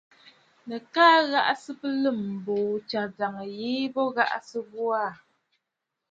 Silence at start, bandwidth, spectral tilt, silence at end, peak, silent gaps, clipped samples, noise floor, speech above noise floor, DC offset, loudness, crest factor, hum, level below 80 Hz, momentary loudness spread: 0.65 s; 8 kHz; -5 dB/octave; 0.95 s; -6 dBFS; none; under 0.1%; -84 dBFS; 58 dB; under 0.1%; -26 LUFS; 22 dB; none; -76 dBFS; 14 LU